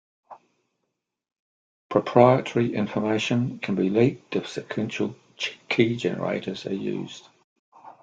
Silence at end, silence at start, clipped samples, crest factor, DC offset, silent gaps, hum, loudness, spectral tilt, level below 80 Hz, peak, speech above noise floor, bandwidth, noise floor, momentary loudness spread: 0.1 s; 0.3 s; under 0.1%; 24 dB; under 0.1%; 1.39-1.90 s, 7.44-7.72 s; none; -25 LUFS; -6.5 dB/octave; -66 dBFS; -2 dBFS; 56 dB; 9 kHz; -80 dBFS; 13 LU